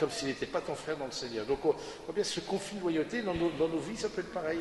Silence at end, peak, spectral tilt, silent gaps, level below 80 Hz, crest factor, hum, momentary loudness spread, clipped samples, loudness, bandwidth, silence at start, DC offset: 0 s; -14 dBFS; -4.5 dB/octave; none; -58 dBFS; 18 dB; none; 5 LU; under 0.1%; -34 LUFS; 11.5 kHz; 0 s; under 0.1%